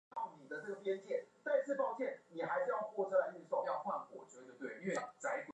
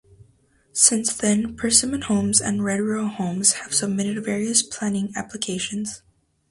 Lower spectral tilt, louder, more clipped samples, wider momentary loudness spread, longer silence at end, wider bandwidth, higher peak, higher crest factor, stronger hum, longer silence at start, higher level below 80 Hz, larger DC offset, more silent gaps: first, -5 dB/octave vs -3 dB/octave; second, -40 LUFS vs -21 LUFS; neither; about the same, 11 LU vs 12 LU; second, 0 s vs 0.5 s; second, 9.8 kHz vs 11.5 kHz; second, -22 dBFS vs -2 dBFS; about the same, 18 dB vs 22 dB; neither; second, 0.15 s vs 0.75 s; second, under -90 dBFS vs -54 dBFS; neither; neither